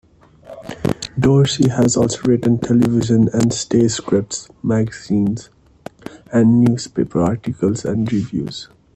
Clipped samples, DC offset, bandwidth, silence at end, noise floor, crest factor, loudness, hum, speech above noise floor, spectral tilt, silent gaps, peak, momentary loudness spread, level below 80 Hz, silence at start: under 0.1%; under 0.1%; 11 kHz; 0.3 s; -41 dBFS; 16 dB; -17 LUFS; none; 26 dB; -6 dB/octave; none; -2 dBFS; 13 LU; -46 dBFS; 0.5 s